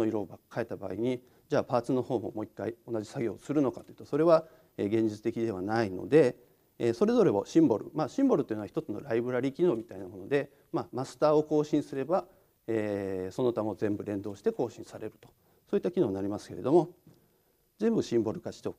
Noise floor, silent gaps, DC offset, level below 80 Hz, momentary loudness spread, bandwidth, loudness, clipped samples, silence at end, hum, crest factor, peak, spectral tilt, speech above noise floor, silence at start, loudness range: -70 dBFS; none; under 0.1%; -70 dBFS; 12 LU; 12.5 kHz; -30 LUFS; under 0.1%; 0.05 s; none; 20 dB; -10 dBFS; -7.5 dB/octave; 40 dB; 0 s; 6 LU